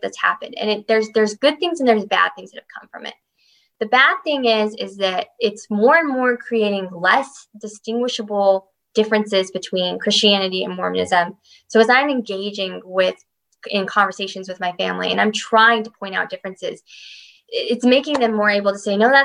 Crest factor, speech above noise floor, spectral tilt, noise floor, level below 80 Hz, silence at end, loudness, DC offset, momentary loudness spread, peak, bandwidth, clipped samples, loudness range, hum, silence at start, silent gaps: 18 dB; 41 dB; -3.5 dB/octave; -60 dBFS; -66 dBFS; 0 s; -18 LUFS; under 0.1%; 16 LU; -2 dBFS; 10.5 kHz; under 0.1%; 2 LU; none; 0 s; none